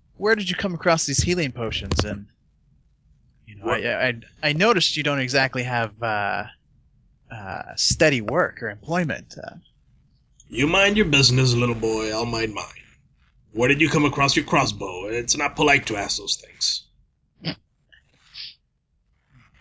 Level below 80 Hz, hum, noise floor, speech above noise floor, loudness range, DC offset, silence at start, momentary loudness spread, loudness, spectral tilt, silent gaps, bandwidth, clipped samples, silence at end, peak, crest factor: -44 dBFS; none; -69 dBFS; 47 dB; 5 LU; under 0.1%; 0.2 s; 17 LU; -21 LUFS; -3.5 dB/octave; none; 8 kHz; under 0.1%; 1.1 s; -4 dBFS; 20 dB